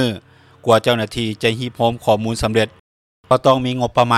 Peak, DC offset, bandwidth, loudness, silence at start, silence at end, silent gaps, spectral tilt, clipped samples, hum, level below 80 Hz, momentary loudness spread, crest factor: -2 dBFS; under 0.1%; 15 kHz; -18 LUFS; 0 s; 0 s; 2.80-3.24 s; -5.5 dB/octave; under 0.1%; none; -42 dBFS; 8 LU; 16 dB